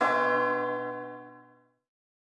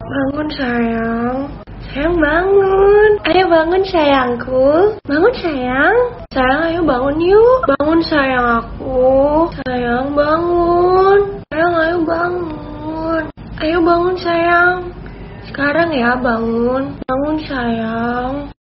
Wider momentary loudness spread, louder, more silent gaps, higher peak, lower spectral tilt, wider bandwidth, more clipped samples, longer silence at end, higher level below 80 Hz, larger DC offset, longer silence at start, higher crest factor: first, 18 LU vs 10 LU; second, -28 LUFS vs -14 LUFS; neither; second, -10 dBFS vs 0 dBFS; first, -5.5 dB/octave vs -4 dB/octave; first, 10 kHz vs 5.8 kHz; neither; first, 0.95 s vs 0.1 s; second, under -90 dBFS vs -34 dBFS; neither; about the same, 0 s vs 0 s; first, 20 dB vs 14 dB